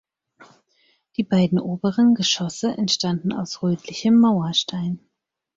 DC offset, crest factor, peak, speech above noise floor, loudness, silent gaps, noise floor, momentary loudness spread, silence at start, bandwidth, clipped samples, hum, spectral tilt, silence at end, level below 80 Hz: under 0.1%; 14 dB; -8 dBFS; 57 dB; -21 LUFS; none; -78 dBFS; 11 LU; 0.4 s; 7.8 kHz; under 0.1%; none; -5 dB/octave; 0.6 s; -60 dBFS